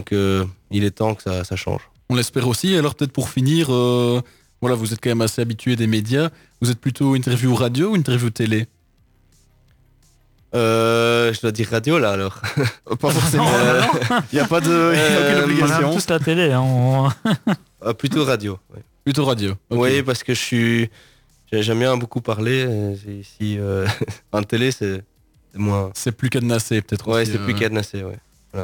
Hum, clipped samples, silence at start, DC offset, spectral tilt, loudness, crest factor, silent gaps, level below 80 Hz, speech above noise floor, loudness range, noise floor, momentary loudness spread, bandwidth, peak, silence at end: none; under 0.1%; 0 s; under 0.1%; -5.5 dB/octave; -19 LUFS; 16 dB; none; -56 dBFS; 38 dB; 6 LU; -57 dBFS; 10 LU; 20 kHz; -4 dBFS; 0 s